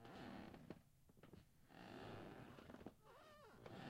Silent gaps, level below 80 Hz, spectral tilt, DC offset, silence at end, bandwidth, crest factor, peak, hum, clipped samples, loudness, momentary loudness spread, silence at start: none; -76 dBFS; -6 dB/octave; under 0.1%; 0 s; 16 kHz; 18 dB; -42 dBFS; none; under 0.1%; -61 LUFS; 10 LU; 0 s